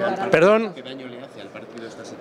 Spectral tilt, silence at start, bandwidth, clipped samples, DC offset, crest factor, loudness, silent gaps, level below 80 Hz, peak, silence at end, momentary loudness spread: -6 dB/octave; 0 s; 12 kHz; under 0.1%; under 0.1%; 22 dB; -18 LUFS; none; -64 dBFS; 0 dBFS; 0 s; 22 LU